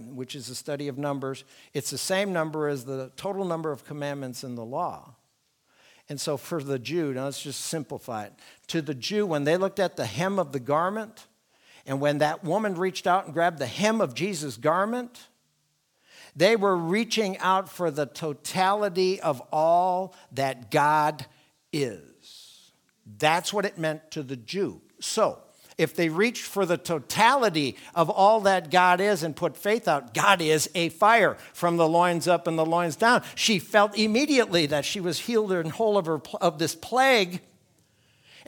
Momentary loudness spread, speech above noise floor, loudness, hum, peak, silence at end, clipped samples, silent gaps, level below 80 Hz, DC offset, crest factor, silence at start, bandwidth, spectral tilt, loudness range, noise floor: 13 LU; 46 dB; -25 LUFS; none; -2 dBFS; 1.1 s; under 0.1%; none; -72 dBFS; under 0.1%; 24 dB; 0 s; 19.5 kHz; -4 dB/octave; 9 LU; -71 dBFS